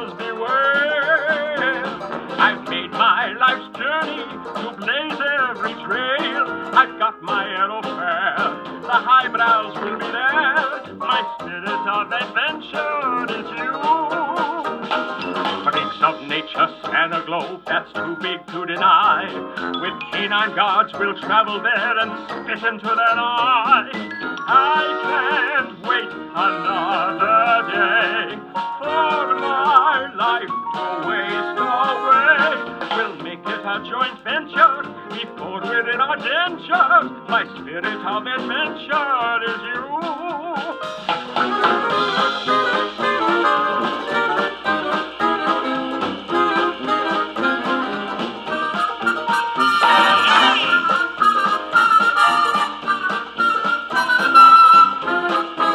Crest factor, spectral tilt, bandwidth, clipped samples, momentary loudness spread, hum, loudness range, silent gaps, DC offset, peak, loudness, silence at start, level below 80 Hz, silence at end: 18 dB; -3.5 dB/octave; 12.5 kHz; under 0.1%; 11 LU; none; 6 LU; none; under 0.1%; 0 dBFS; -18 LUFS; 0 s; -62 dBFS; 0 s